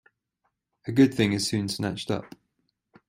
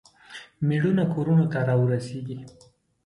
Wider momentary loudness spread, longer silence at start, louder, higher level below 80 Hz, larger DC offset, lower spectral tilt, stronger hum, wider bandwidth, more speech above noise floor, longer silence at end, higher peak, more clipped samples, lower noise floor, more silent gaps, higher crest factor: second, 11 LU vs 20 LU; first, 0.85 s vs 0.3 s; about the same, -25 LUFS vs -24 LUFS; about the same, -60 dBFS vs -62 dBFS; neither; second, -5 dB/octave vs -8.5 dB/octave; neither; first, 16 kHz vs 11 kHz; first, 53 dB vs 23 dB; first, 0.85 s vs 0.55 s; about the same, -8 dBFS vs -10 dBFS; neither; first, -77 dBFS vs -46 dBFS; neither; first, 20 dB vs 14 dB